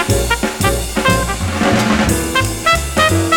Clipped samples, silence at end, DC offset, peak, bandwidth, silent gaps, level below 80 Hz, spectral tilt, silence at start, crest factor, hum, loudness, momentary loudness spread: under 0.1%; 0 s; under 0.1%; 0 dBFS; over 20 kHz; none; -26 dBFS; -4 dB/octave; 0 s; 14 dB; none; -15 LUFS; 3 LU